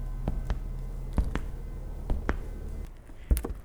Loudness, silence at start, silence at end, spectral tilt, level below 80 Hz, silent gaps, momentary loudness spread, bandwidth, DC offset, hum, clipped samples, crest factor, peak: -36 LUFS; 0 s; 0 s; -6.5 dB/octave; -32 dBFS; none; 10 LU; over 20 kHz; under 0.1%; none; under 0.1%; 24 dB; -6 dBFS